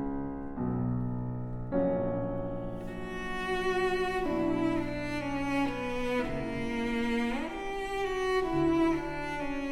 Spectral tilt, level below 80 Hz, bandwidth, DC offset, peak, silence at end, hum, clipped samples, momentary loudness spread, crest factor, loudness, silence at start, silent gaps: -6.5 dB/octave; -44 dBFS; 13.5 kHz; under 0.1%; -18 dBFS; 0 s; none; under 0.1%; 8 LU; 14 dB; -32 LUFS; 0 s; none